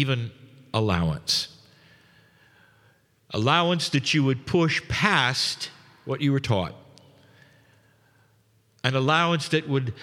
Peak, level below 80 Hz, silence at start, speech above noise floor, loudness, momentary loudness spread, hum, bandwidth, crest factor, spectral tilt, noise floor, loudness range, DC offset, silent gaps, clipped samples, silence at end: -4 dBFS; -52 dBFS; 0 s; 39 dB; -24 LUFS; 13 LU; none; 15.5 kHz; 22 dB; -5 dB/octave; -63 dBFS; 6 LU; under 0.1%; none; under 0.1%; 0 s